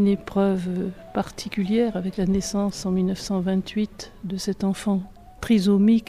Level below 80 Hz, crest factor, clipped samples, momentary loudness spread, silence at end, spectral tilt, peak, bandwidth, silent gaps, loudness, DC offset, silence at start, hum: -46 dBFS; 14 dB; under 0.1%; 9 LU; 0.05 s; -6.5 dB/octave; -8 dBFS; 13.5 kHz; none; -24 LUFS; under 0.1%; 0 s; none